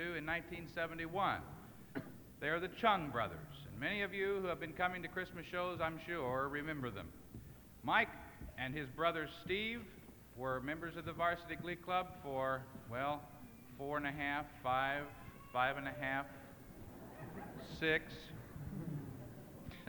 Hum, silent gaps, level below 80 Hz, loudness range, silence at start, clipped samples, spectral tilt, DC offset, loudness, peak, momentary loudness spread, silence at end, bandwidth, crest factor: none; none; -62 dBFS; 3 LU; 0 s; under 0.1%; -5.5 dB/octave; under 0.1%; -40 LUFS; -18 dBFS; 17 LU; 0 s; 19.5 kHz; 24 dB